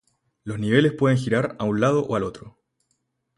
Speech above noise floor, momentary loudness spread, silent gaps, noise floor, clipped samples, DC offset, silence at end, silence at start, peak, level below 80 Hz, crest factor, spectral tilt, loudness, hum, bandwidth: 52 dB; 12 LU; none; -73 dBFS; under 0.1%; under 0.1%; 0.9 s; 0.45 s; -4 dBFS; -56 dBFS; 20 dB; -7 dB/octave; -22 LUFS; none; 11.5 kHz